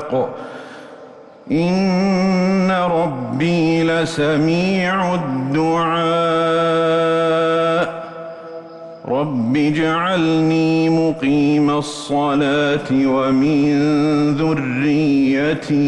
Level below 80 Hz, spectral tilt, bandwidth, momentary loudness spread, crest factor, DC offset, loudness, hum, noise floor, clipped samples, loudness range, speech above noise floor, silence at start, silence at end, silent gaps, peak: -50 dBFS; -6.5 dB/octave; 11 kHz; 8 LU; 8 dB; under 0.1%; -17 LUFS; none; -40 dBFS; under 0.1%; 3 LU; 24 dB; 0 s; 0 s; none; -8 dBFS